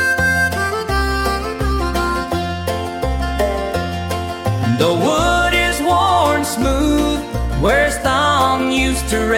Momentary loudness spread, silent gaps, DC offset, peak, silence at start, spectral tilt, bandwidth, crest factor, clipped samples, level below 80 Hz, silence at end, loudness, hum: 7 LU; none; under 0.1%; -2 dBFS; 0 s; -4.5 dB/octave; 17 kHz; 14 dB; under 0.1%; -26 dBFS; 0 s; -17 LUFS; none